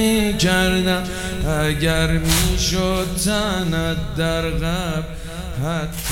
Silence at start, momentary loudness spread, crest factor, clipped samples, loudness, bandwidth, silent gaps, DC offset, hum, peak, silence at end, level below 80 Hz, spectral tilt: 0 s; 8 LU; 18 dB; under 0.1%; -20 LUFS; 17.5 kHz; none; under 0.1%; none; -2 dBFS; 0 s; -28 dBFS; -4.5 dB/octave